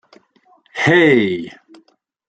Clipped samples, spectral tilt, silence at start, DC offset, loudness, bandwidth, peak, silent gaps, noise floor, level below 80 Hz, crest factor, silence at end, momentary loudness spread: under 0.1%; -6 dB/octave; 0.75 s; under 0.1%; -14 LUFS; 9 kHz; -2 dBFS; none; -56 dBFS; -60 dBFS; 18 dB; 0.8 s; 20 LU